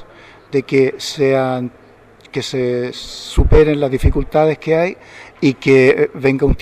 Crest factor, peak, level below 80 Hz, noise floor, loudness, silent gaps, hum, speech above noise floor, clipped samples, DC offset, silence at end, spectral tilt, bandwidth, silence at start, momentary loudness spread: 14 dB; -2 dBFS; -24 dBFS; -45 dBFS; -15 LUFS; none; none; 30 dB; under 0.1%; under 0.1%; 0 s; -6.5 dB/octave; 13 kHz; 0 s; 12 LU